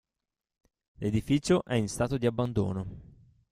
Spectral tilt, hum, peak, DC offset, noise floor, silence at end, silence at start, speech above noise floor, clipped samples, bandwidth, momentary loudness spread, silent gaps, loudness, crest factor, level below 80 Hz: -6.5 dB/octave; none; -12 dBFS; under 0.1%; -89 dBFS; 0.5 s; 1 s; 61 dB; under 0.1%; 15 kHz; 11 LU; none; -29 LUFS; 20 dB; -52 dBFS